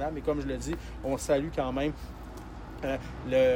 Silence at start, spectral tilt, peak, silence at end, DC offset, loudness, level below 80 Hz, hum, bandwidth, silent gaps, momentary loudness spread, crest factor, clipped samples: 0 s; -5.5 dB/octave; -14 dBFS; 0 s; under 0.1%; -31 LUFS; -42 dBFS; none; 16.5 kHz; none; 15 LU; 16 dB; under 0.1%